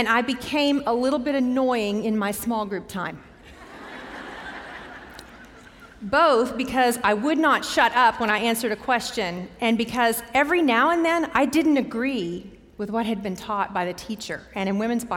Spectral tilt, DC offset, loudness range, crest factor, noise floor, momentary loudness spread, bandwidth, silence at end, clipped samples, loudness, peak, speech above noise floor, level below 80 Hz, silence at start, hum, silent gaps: -4 dB/octave; under 0.1%; 9 LU; 18 dB; -46 dBFS; 18 LU; 17 kHz; 0 s; under 0.1%; -23 LUFS; -6 dBFS; 24 dB; -54 dBFS; 0 s; none; none